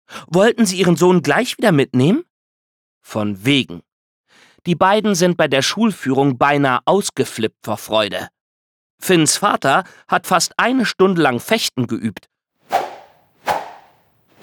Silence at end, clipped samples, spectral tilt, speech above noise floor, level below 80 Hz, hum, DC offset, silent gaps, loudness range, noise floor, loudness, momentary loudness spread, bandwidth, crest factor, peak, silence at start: 0.7 s; under 0.1%; -4.5 dB/octave; 40 dB; -60 dBFS; none; under 0.1%; 2.30-3.01 s, 3.92-4.24 s, 8.41-8.98 s; 4 LU; -56 dBFS; -16 LUFS; 11 LU; 19.5 kHz; 16 dB; -2 dBFS; 0.1 s